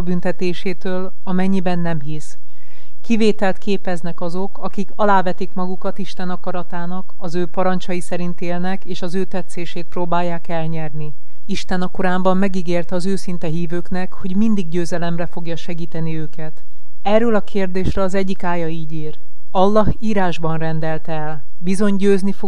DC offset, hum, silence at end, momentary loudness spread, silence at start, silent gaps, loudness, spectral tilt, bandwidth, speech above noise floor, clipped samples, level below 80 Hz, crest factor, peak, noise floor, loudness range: 30%; none; 0 s; 11 LU; 0 s; none; -22 LUFS; -7 dB/octave; 11.5 kHz; 28 dB; under 0.1%; -40 dBFS; 18 dB; 0 dBFS; -49 dBFS; 4 LU